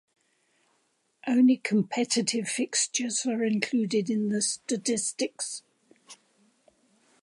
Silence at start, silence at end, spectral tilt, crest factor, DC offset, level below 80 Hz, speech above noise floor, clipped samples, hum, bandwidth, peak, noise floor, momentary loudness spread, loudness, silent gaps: 1.25 s; 1.1 s; -3.5 dB/octave; 20 dB; under 0.1%; -82 dBFS; 45 dB; under 0.1%; none; 11.5 kHz; -8 dBFS; -72 dBFS; 9 LU; -27 LUFS; none